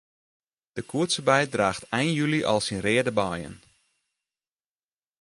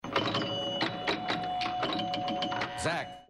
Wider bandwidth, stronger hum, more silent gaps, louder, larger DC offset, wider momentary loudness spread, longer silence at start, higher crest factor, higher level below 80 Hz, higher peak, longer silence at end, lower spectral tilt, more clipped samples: about the same, 11.5 kHz vs 12.5 kHz; neither; neither; first, -25 LUFS vs -32 LUFS; neither; first, 14 LU vs 2 LU; first, 0.75 s vs 0.05 s; about the same, 22 dB vs 18 dB; about the same, -58 dBFS vs -60 dBFS; first, -6 dBFS vs -14 dBFS; first, 1.65 s vs 0.05 s; about the same, -4.5 dB/octave vs -4 dB/octave; neither